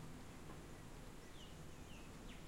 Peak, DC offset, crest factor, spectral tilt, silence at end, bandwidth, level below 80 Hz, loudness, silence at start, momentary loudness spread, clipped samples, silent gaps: -42 dBFS; under 0.1%; 12 dB; -4.5 dB/octave; 0 s; 16 kHz; -60 dBFS; -57 LUFS; 0 s; 1 LU; under 0.1%; none